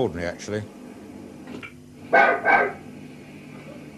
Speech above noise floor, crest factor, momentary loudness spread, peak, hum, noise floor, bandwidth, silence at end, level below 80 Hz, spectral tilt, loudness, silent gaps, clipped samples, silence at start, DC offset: 21 dB; 22 dB; 24 LU; -4 dBFS; none; -42 dBFS; 13 kHz; 0 s; -56 dBFS; -5 dB/octave; -21 LUFS; none; under 0.1%; 0 s; under 0.1%